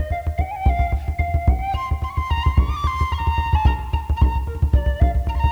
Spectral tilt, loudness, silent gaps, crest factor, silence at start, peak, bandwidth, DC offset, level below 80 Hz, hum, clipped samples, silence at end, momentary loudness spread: -7.5 dB/octave; -21 LUFS; none; 16 dB; 0 s; -4 dBFS; 6.6 kHz; under 0.1%; -20 dBFS; none; under 0.1%; 0 s; 5 LU